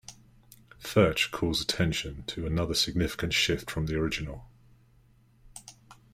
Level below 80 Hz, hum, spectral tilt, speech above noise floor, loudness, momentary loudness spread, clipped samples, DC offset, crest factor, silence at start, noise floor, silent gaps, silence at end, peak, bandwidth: -46 dBFS; none; -4.5 dB/octave; 33 dB; -28 LUFS; 22 LU; under 0.1%; under 0.1%; 22 dB; 0.1 s; -61 dBFS; none; 0.2 s; -10 dBFS; 16 kHz